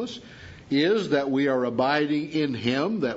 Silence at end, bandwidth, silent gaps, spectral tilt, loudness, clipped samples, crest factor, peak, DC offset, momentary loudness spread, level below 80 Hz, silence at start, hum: 0 s; 8 kHz; none; -6 dB/octave; -24 LUFS; under 0.1%; 16 dB; -8 dBFS; under 0.1%; 14 LU; -62 dBFS; 0 s; none